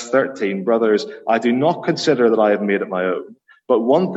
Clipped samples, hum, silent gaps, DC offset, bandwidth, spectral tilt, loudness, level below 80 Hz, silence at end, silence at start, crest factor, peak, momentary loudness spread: under 0.1%; none; none; under 0.1%; 8.2 kHz; -6 dB/octave; -18 LUFS; -68 dBFS; 0 s; 0 s; 16 dB; -2 dBFS; 6 LU